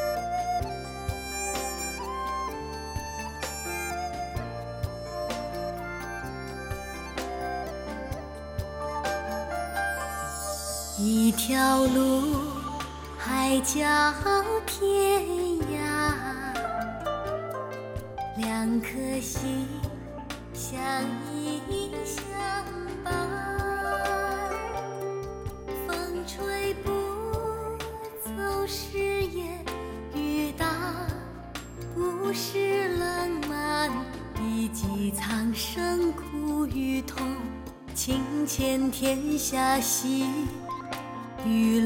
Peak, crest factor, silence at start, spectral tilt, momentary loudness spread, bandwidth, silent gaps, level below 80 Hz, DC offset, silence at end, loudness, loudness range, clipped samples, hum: -10 dBFS; 20 dB; 0 s; -4 dB/octave; 12 LU; 17.5 kHz; none; -44 dBFS; under 0.1%; 0 s; -29 LUFS; 8 LU; under 0.1%; none